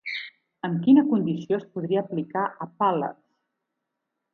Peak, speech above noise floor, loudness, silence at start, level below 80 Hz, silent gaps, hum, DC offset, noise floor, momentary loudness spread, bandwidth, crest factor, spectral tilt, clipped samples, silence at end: -8 dBFS; 59 dB; -25 LUFS; 0.05 s; -74 dBFS; none; none; under 0.1%; -82 dBFS; 15 LU; 6.4 kHz; 18 dB; -8.5 dB/octave; under 0.1%; 1.2 s